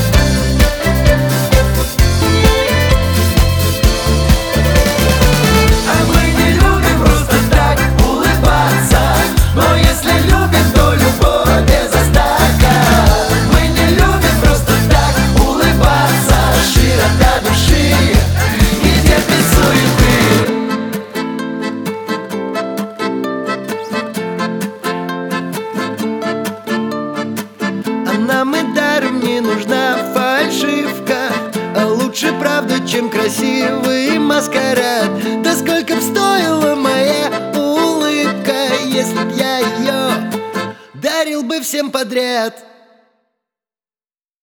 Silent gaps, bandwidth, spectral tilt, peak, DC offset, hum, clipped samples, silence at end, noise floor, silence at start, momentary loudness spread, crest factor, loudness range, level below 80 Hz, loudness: none; over 20 kHz; -5 dB/octave; 0 dBFS; under 0.1%; none; under 0.1%; 1.85 s; under -90 dBFS; 0 s; 9 LU; 12 dB; 9 LU; -18 dBFS; -13 LUFS